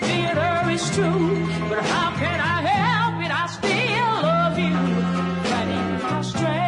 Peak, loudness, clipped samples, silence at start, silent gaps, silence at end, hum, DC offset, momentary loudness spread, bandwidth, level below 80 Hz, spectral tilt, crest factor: -10 dBFS; -21 LUFS; under 0.1%; 0 s; none; 0 s; none; under 0.1%; 4 LU; 11 kHz; -52 dBFS; -5.5 dB/octave; 12 dB